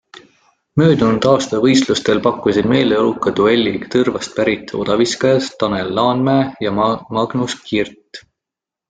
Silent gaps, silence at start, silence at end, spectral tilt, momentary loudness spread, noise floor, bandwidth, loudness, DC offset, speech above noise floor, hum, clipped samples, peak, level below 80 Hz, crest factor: none; 0.75 s; 0.7 s; -5.5 dB/octave; 6 LU; -86 dBFS; 9.4 kHz; -16 LUFS; under 0.1%; 70 dB; none; under 0.1%; -2 dBFS; -48 dBFS; 14 dB